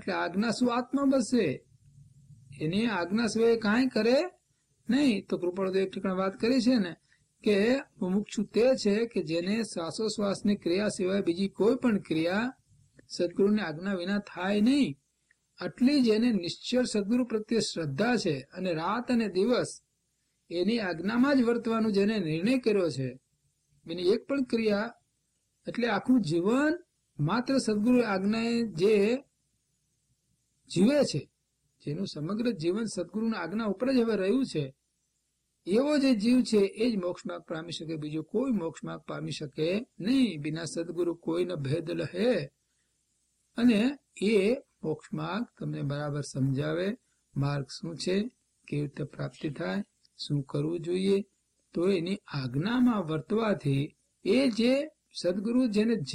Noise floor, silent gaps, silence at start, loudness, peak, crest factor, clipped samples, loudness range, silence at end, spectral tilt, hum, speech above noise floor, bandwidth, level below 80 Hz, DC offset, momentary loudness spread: -78 dBFS; none; 0 s; -29 LUFS; -14 dBFS; 16 dB; under 0.1%; 5 LU; 0 s; -6 dB/octave; none; 50 dB; 11.5 kHz; -64 dBFS; under 0.1%; 11 LU